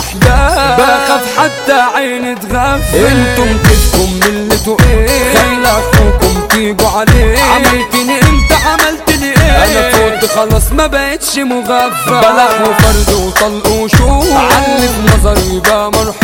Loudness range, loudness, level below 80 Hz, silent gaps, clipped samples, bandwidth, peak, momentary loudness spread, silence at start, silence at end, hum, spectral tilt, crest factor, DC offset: 1 LU; -9 LUFS; -16 dBFS; none; 1%; 17.5 kHz; 0 dBFS; 4 LU; 0 s; 0 s; none; -4.5 dB/octave; 8 dB; under 0.1%